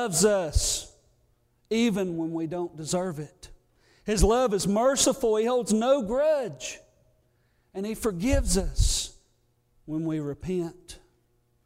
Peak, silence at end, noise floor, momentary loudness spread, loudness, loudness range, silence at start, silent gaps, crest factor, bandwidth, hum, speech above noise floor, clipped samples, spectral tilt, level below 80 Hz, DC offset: -8 dBFS; 0.7 s; -68 dBFS; 15 LU; -26 LUFS; 6 LU; 0 s; none; 18 dB; 16 kHz; none; 43 dB; under 0.1%; -4.5 dB/octave; -36 dBFS; under 0.1%